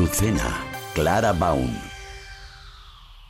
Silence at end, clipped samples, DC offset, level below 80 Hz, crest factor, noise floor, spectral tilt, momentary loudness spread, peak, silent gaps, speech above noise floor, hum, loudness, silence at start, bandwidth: 0 s; under 0.1%; under 0.1%; -36 dBFS; 16 dB; -45 dBFS; -5 dB/octave; 22 LU; -8 dBFS; none; 23 dB; none; -23 LUFS; 0 s; 16.5 kHz